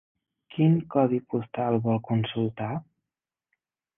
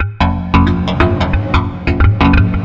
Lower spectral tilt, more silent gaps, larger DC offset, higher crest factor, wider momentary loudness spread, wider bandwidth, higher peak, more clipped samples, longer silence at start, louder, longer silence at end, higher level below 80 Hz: first, -11.5 dB/octave vs -8 dB/octave; neither; neither; first, 18 dB vs 12 dB; first, 10 LU vs 5 LU; second, 3.7 kHz vs 7 kHz; second, -8 dBFS vs 0 dBFS; neither; first, 0.55 s vs 0 s; second, -26 LUFS vs -13 LUFS; first, 1.15 s vs 0 s; second, -64 dBFS vs -18 dBFS